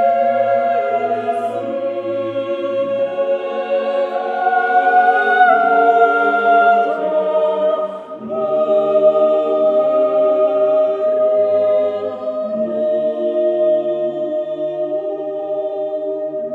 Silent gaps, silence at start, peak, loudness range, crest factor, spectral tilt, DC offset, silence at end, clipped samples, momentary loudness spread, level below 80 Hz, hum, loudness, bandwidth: none; 0 s; 0 dBFS; 6 LU; 16 dB; -6.5 dB/octave; under 0.1%; 0 s; under 0.1%; 10 LU; -72 dBFS; none; -16 LUFS; 4.7 kHz